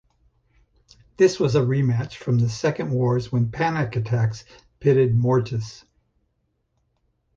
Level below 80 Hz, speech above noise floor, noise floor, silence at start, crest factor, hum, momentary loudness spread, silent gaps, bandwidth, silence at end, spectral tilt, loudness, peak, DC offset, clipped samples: -52 dBFS; 51 dB; -71 dBFS; 1.2 s; 18 dB; none; 8 LU; none; 7.6 kHz; 1.6 s; -7.5 dB/octave; -22 LUFS; -6 dBFS; under 0.1%; under 0.1%